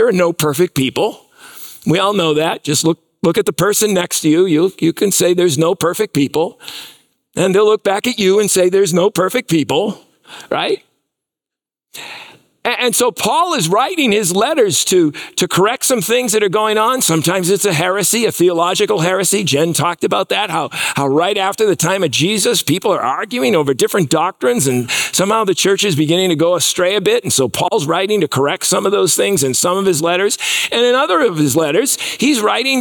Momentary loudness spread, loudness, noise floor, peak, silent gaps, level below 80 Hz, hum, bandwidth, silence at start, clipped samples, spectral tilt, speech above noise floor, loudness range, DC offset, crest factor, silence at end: 5 LU; -14 LUFS; -87 dBFS; -4 dBFS; none; -58 dBFS; none; 19 kHz; 0 s; under 0.1%; -3.5 dB/octave; 73 dB; 3 LU; under 0.1%; 12 dB; 0 s